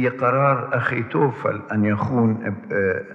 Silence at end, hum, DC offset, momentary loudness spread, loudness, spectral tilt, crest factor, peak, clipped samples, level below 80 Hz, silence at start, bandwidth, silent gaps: 0 s; none; under 0.1%; 6 LU; -21 LUFS; -9.5 dB/octave; 16 dB; -6 dBFS; under 0.1%; -64 dBFS; 0 s; 6.2 kHz; none